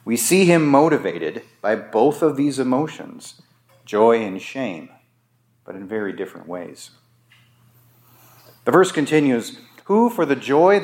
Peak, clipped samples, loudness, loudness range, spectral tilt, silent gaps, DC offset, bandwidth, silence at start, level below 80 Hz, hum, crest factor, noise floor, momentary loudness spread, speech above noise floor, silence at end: 0 dBFS; under 0.1%; -19 LUFS; 15 LU; -5 dB/octave; none; under 0.1%; 17 kHz; 0.05 s; -74 dBFS; none; 20 dB; -63 dBFS; 21 LU; 44 dB; 0 s